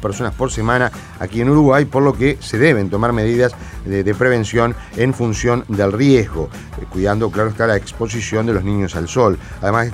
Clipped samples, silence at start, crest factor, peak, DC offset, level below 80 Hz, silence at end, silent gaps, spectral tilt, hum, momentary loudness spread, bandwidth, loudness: under 0.1%; 0 s; 16 dB; 0 dBFS; under 0.1%; -34 dBFS; 0 s; none; -6.5 dB/octave; none; 9 LU; 15 kHz; -16 LUFS